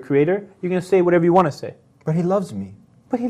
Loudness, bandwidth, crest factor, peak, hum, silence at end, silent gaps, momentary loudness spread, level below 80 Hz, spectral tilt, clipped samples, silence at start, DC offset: -19 LUFS; 11.5 kHz; 16 dB; -2 dBFS; none; 0 s; none; 18 LU; -60 dBFS; -8 dB/octave; under 0.1%; 0 s; under 0.1%